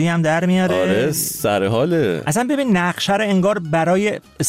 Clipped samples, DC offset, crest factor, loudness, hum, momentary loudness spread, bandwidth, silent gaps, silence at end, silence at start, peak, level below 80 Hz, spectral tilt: under 0.1%; under 0.1%; 12 dB; -18 LUFS; none; 2 LU; 16 kHz; none; 0 s; 0 s; -6 dBFS; -52 dBFS; -5 dB/octave